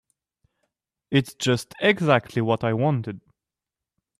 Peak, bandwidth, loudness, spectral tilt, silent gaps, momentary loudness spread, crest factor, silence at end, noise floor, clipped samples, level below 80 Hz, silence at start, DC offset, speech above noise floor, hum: -4 dBFS; 14.5 kHz; -23 LUFS; -6 dB/octave; none; 7 LU; 20 dB; 1 s; -88 dBFS; under 0.1%; -62 dBFS; 1.1 s; under 0.1%; 66 dB; none